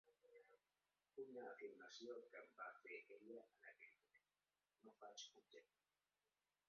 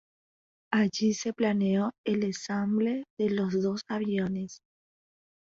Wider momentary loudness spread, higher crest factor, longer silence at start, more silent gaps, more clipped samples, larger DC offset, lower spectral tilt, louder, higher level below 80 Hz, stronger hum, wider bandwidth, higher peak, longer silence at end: first, 9 LU vs 5 LU; about the same, 20 dB vs 18 dB; second, 0.05 s vs 0.7 s; second, none vs 1.98-2.04 s, 3.10-3.17 s; neither; neither; second, -0.5 dB/octave vs -6 dB/octave; second, -60 LUFS vs -29 LUFS; second, under -90 dBFS vs -68 dBFS; first, 50 Hz at -110 dBFS vs none; second, 6.8 kHz vs 7.6 kHz; second, -44 dBFS vs -12 dBFS; first, 1.05 s vs 0.85 s